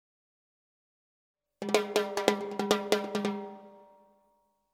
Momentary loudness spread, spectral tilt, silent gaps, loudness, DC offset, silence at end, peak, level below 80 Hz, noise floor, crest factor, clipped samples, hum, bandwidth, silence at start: 13 LU; -3.5 dB/octave; none; -30 LUFS; under 0.1%; 0.9 s; -4 dBFS; -74 dBFS; -72 dBFS; 30 dB; under 0.1%; 50 Hz at -75 dBFS; 17 kHz; 1.6 s